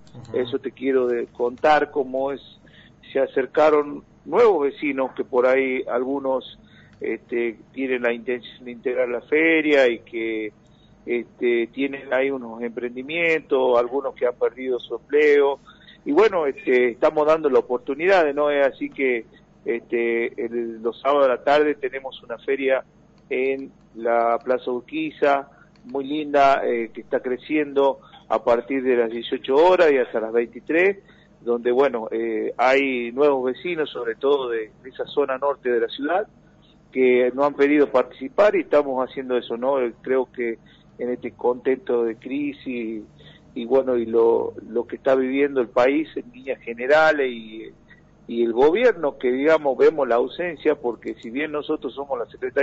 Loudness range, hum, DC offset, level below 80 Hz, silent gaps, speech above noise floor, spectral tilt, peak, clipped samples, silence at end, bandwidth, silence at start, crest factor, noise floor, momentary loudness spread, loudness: 4 LU; 50 Hz at -60 dBFS; under 0.1%; -60 dBFS; none; 32 dB; -2.5 dB/octave; -8 dBFS; under 0.1%; 0 s; 7.6 kHz; 0.15 s; 14 dB; -53 dBFS; 12 LU; -22 LUFS